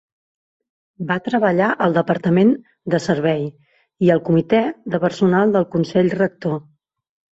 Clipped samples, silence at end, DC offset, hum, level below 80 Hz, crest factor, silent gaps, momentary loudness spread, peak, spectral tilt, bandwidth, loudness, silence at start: under 0.1%; 0.75 s; under 0.1%; none; -58 dBFS; 16 dB; none; 9 LU; -2 dBFS; -7.5 dB/octave; 8 kHz; -18 LUFS; 1 s